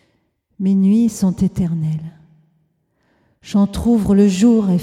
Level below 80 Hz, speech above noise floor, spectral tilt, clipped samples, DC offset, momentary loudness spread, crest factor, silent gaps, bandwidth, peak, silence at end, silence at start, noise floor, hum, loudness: -40 dBFS; 50 dB; -7.5 dB/octave; under 0.1%; under 0.1%; 10 LU; 14 dB; none; 13 kHz; -4 dBFS; 0 s; 0.6 s; -64 dBFS; none; -16 LUFS